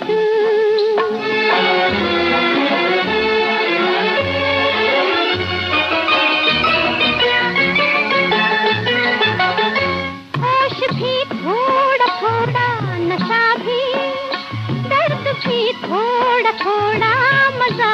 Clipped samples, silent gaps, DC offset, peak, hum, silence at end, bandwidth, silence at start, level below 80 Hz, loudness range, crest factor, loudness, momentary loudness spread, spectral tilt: under 0.1%; none; under 0.1%; -4 dBFS; none; 0 s; 8.4 kHz; 0 s; -52 dBFS; 4 LU; 12 dB; -15 LUFS; 6 LU; -5.5 dB/octave